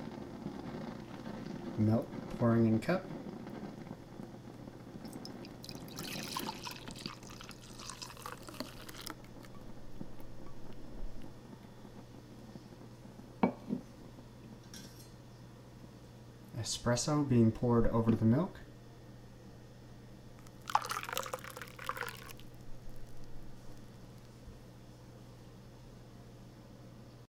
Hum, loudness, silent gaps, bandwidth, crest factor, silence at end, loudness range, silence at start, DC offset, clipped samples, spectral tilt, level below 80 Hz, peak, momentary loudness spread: none; -37 LUFS; none; 17.5 kHz; 26 dB; 0.05 s; 19 LU; 0 s; under 0.1%; under 0.1%; -6 dB/octave; -54 dBFS; -12 dBFS; 23 LU